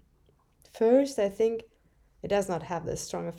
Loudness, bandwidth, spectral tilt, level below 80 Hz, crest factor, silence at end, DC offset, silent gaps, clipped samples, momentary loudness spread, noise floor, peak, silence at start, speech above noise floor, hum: -28 LUFS; 14.5 kHz; -5.5 dB/octave; -58 dBFS; 18 dB; 0 s; under 0.1%; none; under 0.1%; 11 LU; -65 dBFS; -10 dBFS; 0.75 s; 38 dB; none